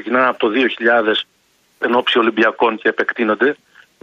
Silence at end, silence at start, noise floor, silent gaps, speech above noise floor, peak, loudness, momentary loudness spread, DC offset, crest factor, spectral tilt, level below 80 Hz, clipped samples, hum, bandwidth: 0.5 s; 0 s; -52 dBFS; none; 36 dB; -2 dBFS; -16 LUFS; 6 LU; under 0.1%; 14 dB; -5 dB/octave; -66 dBFS; under 0.1%; none; 7.4 kHz